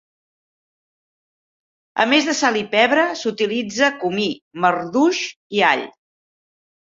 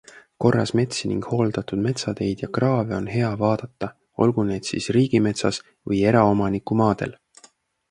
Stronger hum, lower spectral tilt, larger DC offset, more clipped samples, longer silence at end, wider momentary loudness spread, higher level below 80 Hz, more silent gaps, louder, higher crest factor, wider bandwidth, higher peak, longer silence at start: neither; second, -3 dB/octave vs -6.5 dB/octave; neither; neither; first, 0.95 s vs 0.8 s; about the same, 8 LU vs 8 LU; second, -66 dBFS vs -50 dBFS; first, 4.42-4.51 s, 5.36-5.50 s vs none; first, -18 LUFS vs -22 LUFS; about the same, 20 dB vs 20 dB; second, 7.8 kHz vs 11 kHz; about the same, -2 dBFS vs -2 dBFS; first, 1.95 s vs 0.15 s